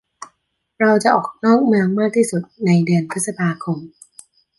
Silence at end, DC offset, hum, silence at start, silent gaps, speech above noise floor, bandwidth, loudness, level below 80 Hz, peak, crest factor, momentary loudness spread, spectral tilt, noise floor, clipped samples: 0.7 s; under 0.1%; none; 0.2 s; none; 52 dB; 11.5 kHz; -17 LUFS; -64 dBFS; -2 dBFS; 16 dB; 9 LU; -6 dB/octave; -69 dBFS; under 0.1%